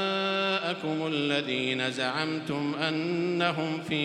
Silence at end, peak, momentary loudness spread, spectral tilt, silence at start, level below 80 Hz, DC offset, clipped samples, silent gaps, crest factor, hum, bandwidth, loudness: 0 s; -10 dBFS; 4 LU; -5 dB/octave; 0 s; -72 dBFS; under 0.1%; under 0.1%; none; 18 dB; none; 12 kHz; -28 LUFS